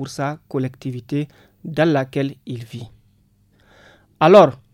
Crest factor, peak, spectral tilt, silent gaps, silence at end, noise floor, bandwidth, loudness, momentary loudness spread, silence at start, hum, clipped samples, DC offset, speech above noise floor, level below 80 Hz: 20 dB; 0 dBFS; -7 dB/octave; none; 0.2 s; -58 dBFS; 13 kHz; -18 LUFS; 22 LU; 0 s; none; under 0.1%; under 0.1%; 40 dB; -58 dBFS